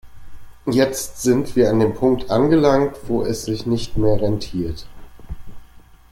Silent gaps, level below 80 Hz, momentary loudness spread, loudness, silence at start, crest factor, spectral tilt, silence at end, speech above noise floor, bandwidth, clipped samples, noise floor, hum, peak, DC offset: none; -38 dBFS; 15 LU; -19 LUFS; 0.05 s; 16 dB; -6 dB/octave; 0.35 s; 26 dB; 16.5 kHz; under 0.1%; -44 dBFS; none; -2 dBFS; under 0.1%